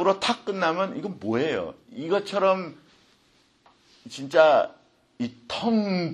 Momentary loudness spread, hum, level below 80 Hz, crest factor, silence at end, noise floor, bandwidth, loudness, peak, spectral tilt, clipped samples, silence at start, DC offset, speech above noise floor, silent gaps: 16 LU; none; -68 dBFS; 22 dB; 0 s; -63 dBFS; 11.5 kHz; -24 LUFS; -4 dBFS; -5.5 dB/octave; under 0.1%; 0 s; under 0.1%; 38 dB; none